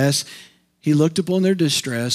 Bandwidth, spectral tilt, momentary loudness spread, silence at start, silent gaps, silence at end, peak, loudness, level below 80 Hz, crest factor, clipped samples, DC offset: 16 kHz; -5 dB/octave; 8 LU; 0 s; none; 0 s; -6 dBFS; -19 LUFS; -70 dBFS; 14 dB; under 0.1%; under 0.1%